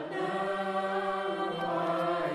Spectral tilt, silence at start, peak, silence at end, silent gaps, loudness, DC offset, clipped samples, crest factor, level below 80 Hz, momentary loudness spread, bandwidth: -6 dB/octave; 0 s; -18 dBFS; 0 s; none; -32 LUFS; under 0.1%; under 0.1%; 14 dB; -72 dBFS; 3 LU; 13 kHz